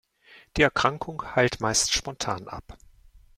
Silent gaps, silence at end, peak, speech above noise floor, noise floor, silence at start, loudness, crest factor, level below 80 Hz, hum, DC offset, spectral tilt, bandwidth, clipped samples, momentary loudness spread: none; 0.2 s; -4 dBFS; 29 dB; -55 dBFS; 0.3 s; -25 LUFS; 24 dB; -48 dBFS; none; under 0.1%; -3 dB/octave; 16.5 kHz; under 0.1%; 13 LU